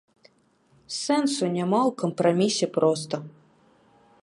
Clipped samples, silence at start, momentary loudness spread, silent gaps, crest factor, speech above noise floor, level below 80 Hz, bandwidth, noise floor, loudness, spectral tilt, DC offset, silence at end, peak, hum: under 0.1%; 0.9 s; 11 LU; none; 18 dB; 39 dB; -74 dBFS; 11.5 kHz; -63 dBFS; -24 LUFS; -5 dB/octave; under 0.1%; 0.95 s; -8 dBFS; none